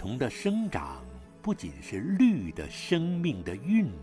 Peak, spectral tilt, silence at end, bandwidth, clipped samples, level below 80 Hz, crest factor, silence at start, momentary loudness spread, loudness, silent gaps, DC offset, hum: -14 dBFS; -6.5 dB/octave; 0 s; 11 kHz; under 0.1%; -50 dBFS; 16 dB; 0 s; 13 LU; -30 LUFS; none; under 0.1%; none